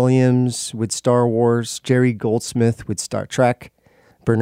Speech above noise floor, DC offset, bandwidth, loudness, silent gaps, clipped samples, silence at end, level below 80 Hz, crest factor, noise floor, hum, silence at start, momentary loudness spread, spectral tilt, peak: 36 dB; under 0.1%; 15.5 kHz; -19 LUFS; none; under 0.1%; 0 s; -54 dBFS; 16 dB; -54 dBFS; none; 0 s; 8 LU; -6 dB/octave; -2 dBFS